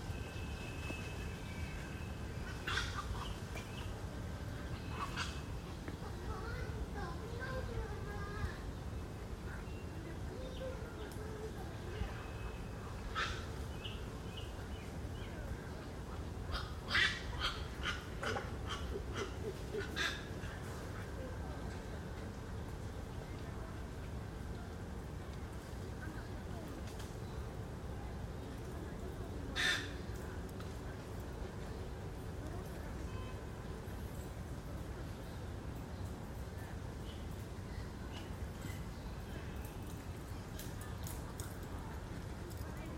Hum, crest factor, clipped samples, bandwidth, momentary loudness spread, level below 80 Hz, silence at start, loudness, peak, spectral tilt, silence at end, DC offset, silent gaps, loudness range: none; 24 dB; under 0.1%; 16 kHz; 7 LU; -50 dBFS; 0 s; -44 LUFS; -20 dBFS; -5 dB/octave; 0 s; under 0.1%; none; 7 LU